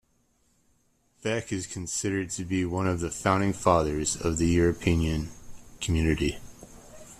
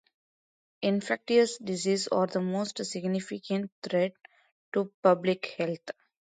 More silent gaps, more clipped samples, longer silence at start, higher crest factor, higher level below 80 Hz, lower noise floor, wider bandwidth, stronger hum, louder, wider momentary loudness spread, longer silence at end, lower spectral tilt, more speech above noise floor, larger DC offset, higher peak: second, none vs 3.72-3.82 s, 4.52-4.72 s, 4.94-5.03 s; neither; first, 1.25 s vs 0.8 s; about the same, 22 dB vs 20 dB; first, -42 dBFS vs -76 dBFS; second, -68 dBFS vs under -90 dBFS; first, 14 kHz vs 9.4 kHz; neither; about the same, -27 LUFS vs -29 LUFS; about the same, 10 LU vs 8 LU; second, 0.05 s vs 0.3 s; about the same, -5 dB/octave vs -5 dB/octave; second, 42 dB vs over 62 dB; neither; first, -6 dBFS vs -10 dBFS